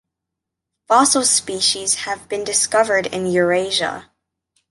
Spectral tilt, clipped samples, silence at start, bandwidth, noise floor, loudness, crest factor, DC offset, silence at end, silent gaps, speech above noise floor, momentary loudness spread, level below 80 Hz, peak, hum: -1.5 dB/octave; under 0.1%; 0.9 s; 12 kHz; -82 dBFS; -17 LUFS; 18 dB; under 0.1%; 0.7 s; none; 64 dB; 10 LU; -58 dBFS; -2 dBFS; none